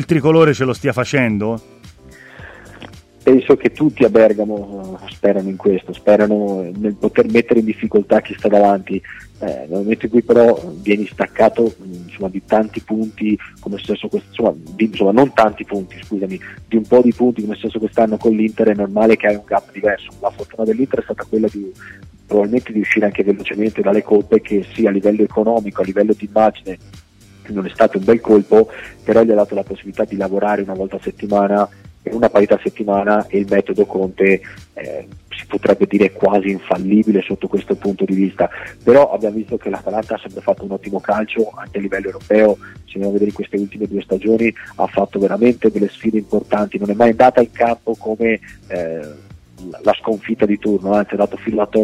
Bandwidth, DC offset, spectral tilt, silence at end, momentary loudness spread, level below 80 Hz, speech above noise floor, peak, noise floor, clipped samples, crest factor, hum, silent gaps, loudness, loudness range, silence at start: 11.5 kHz; under 0.1%; -7.5 dB/octave; 0 s; 13 LU; -48 dBFS; 25 dB; -2 dBFS; -41 dBFS; under 0.1%; 14 dB; none; none; -16 LUFS; 4 LU; 0 s